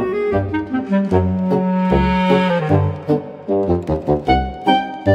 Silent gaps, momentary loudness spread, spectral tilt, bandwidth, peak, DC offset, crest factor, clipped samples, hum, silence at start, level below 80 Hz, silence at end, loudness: none; 6 LU; -8.5 dB/octave; 7.8 kHz; 0 dBFS; under 0.1%; 16 dB; under 0.1%; none; 0 s; -32 dBFS; 0 s; -18 LUFS